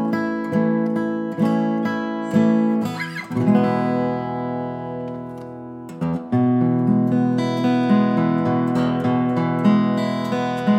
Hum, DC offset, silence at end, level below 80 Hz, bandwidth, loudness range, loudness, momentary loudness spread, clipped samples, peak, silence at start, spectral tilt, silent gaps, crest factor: none; under 0.1%; 0 s; -64 dBFS; 9.4 kHz; 4 LU; -20 LUFS; 11 LU; under 0.1%; -6 dBFS; 0 s; -8 dB/octave; none; 14 dB